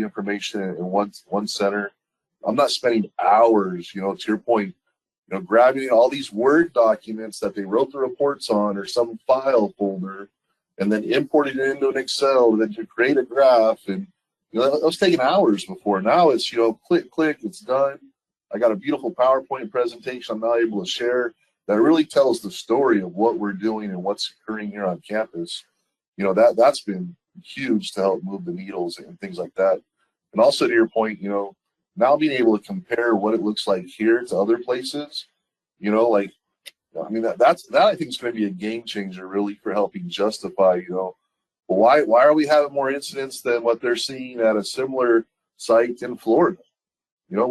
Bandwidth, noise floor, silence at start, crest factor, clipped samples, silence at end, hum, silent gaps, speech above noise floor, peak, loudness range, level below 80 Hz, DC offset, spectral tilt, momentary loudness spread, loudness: 12.5 kHz; -77 dBFS; 0 s; 18 dB; under 0.1%; 0 s; none; 5.18-5.23 s, 26.08-26.13 s, 47.12-47.17 s; 57 dB; -4 dBFS; 4 LU; -68 dBFS; under 0.1%; -5 dB/octave; 13 LU; -21 LUFS